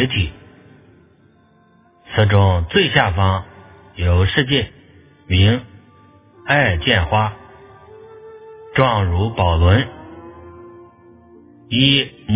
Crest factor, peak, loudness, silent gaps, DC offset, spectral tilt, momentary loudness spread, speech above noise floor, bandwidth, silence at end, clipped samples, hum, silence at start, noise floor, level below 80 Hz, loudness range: 18 dB; 0 dBFS; -16 LUFS; none; under 0.1%; -10 dB/octave; 13 LU; 38 dB; 4 kHz; 0 s; under 0.1%; none; 0 s; -53 dBFS; -28 dBFS; 3 LU